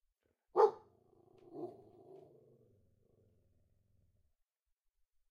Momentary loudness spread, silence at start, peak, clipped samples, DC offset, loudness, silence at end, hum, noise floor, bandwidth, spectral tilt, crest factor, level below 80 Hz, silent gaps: 23 LU; 0.55 s; -16 dBFS; under 0.1%; under 0.1%; -33 LUFS; 3.6 s; none; -85 dBFS; 6.8 kHz; -6.5 dB/octave; 26 dB; -82 dBFS; none